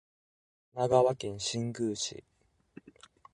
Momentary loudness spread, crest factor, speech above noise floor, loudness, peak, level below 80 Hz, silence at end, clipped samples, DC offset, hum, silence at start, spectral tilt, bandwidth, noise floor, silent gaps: 14 LU; 22 dB; 27 dB; -31 LUFS; -12 dBFS; -66 dBFS; 1.15 s; under 0.1%; under 0.1%; none; 0.75 s; -4.5 dB/octave; 11.5 kHz; -58 dBFS; none